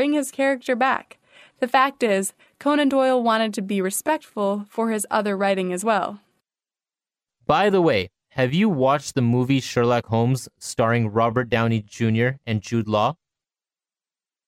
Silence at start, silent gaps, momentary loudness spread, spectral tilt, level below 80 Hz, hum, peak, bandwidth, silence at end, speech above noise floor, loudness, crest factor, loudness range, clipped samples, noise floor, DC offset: 0 s; none; 6 LU; -5.5 dB/octave; -60 dBFS; none; -4 dBFS; 15.5 kHz; 1.35 s; over 69 dB; -22 LUFS; 18 dB; 3 LU; under 0.1%; under -90 dBFS; under 0.1%